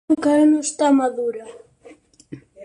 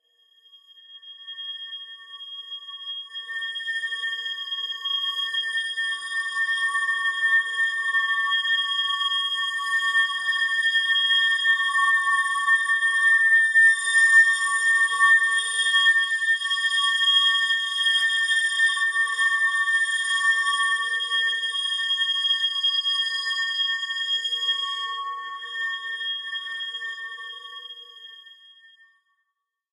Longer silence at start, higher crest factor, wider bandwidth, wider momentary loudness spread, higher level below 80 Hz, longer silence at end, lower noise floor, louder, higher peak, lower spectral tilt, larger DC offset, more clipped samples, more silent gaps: second, 0.1 s vs 0.9 s; about the same, 14 dB vs 16 dB; about the same, 11 kHz vs 12 kHz; second, 12 LU vs 16 LU; first, -62 dBFS vs under -90 dBFS; second, 0 s vs 1.4 s; second, -48 dBFS vs -81 dBFS; first, -18 LUFS vs -21 LUFS; about the same, -6 dBFS vs -8 dBFS; first, -4 dB/octave vs 9 dB/octave; neither; neither; neither